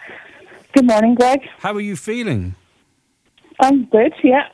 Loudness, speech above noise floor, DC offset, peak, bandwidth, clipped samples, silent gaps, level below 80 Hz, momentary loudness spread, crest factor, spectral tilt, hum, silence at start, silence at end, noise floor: -16 LUFS; 48 dB; under 0.1%; 0 dBFS; 11 kHz; under 0.1%; none; -52 dBFS; 11 LU; 16 dB; -6 dB/octave; none; 0 s; 0.05 s; -63 dBFS